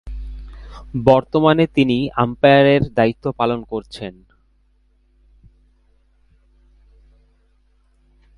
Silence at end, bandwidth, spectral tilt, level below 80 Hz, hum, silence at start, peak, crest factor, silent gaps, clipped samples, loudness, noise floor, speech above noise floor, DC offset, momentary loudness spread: 4.25 s; 11 kHz; -8 dB/octave; -40 dBFS; none; 0.05 s; 0 dBFS; 20 dB; none; under 0.1%; -16 LUFS; -58 dBFS; 42 dB; under 0.1%; 22 LU